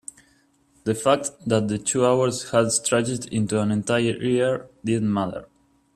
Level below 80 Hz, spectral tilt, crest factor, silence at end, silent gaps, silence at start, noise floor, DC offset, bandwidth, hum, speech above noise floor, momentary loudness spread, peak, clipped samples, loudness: -58 dBFS; -4.5 dB/octave; 20 dB; 0.5 s; none; 0.85 s; -61 dBFS; under 0.1%; 14 kHz; none; 39 dB; 8 LU; -4 dBFS; under 0.1%; -23 LUFS